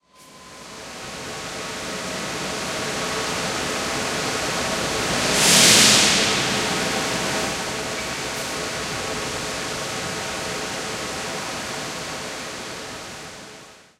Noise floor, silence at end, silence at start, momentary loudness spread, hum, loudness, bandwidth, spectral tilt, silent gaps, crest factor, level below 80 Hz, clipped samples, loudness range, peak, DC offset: -46 dBFS; 0.2 s; 0.2 s; 18 LU; none; -21 LUFS; 16 kHz; -1.5 dB/octave; none; 22 dB; -48 dBFS; under 0.1%; 12 LU; -2 dBFS; under 0.1%